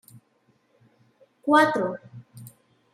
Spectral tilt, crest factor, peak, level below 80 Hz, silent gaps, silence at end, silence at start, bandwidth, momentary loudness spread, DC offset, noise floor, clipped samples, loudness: -5 dB/octave; 20 dB; -6 dBFS; -78 dBFS; none; 0.45 s; 1.45 s; 16 kHz; 28 LU; under 0.1%; -66 dBFS; under 0.1%; -22 LUFS